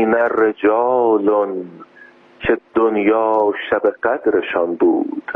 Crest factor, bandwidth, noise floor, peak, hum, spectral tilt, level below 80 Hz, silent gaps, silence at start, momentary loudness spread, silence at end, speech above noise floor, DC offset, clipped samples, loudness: 12 dB; 3.8 kHz; -45 dBFS; -4 dBFS; none; -8.5 dB/octave; -52 dBFS; none; 0 s; 5 LU; 0 s; 29 dB; under 0.1%; under 0.1%; -17 LUFS